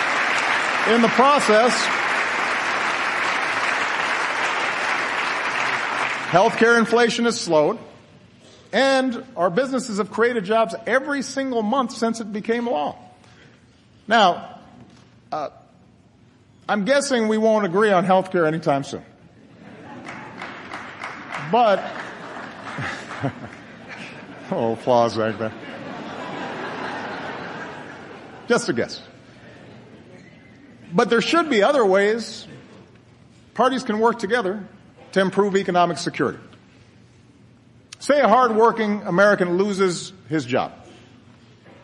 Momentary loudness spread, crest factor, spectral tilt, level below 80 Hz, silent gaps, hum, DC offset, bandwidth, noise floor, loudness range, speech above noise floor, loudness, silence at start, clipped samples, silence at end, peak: 18 LU; 20 dB; -4.5 dB/octave; -64 dBFS; none; none; under 0.1%; 11.5 kHz; -53 dBFS; 8 LU; 34 dB; -20 LUFS; 0 s; under 0.1%; 0.9 s; -2 dBFS